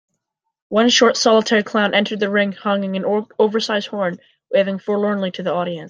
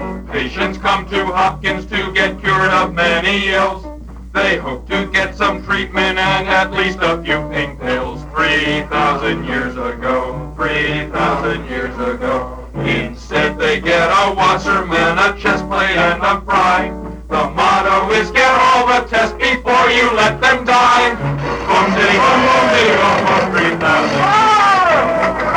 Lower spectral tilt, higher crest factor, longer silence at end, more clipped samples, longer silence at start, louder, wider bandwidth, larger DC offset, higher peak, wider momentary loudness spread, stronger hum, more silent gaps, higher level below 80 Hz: about the same, -4 dB/octave vs -4.5 dB/octave; about the same, 18 dB vs 14 dB; about the same, 0 s vs 0 s; neither; first, 0.7 s vs 0 s; second, -18 LUFS vs -14 LUFS; second, 9.6 kHz vs over 20 kHz; neither; about the same, -2 dBFS vs 0 dBFS; about the same, 9 LU vs 10 LU; neither; neither; second, -66 dBFS vs -32 dBFS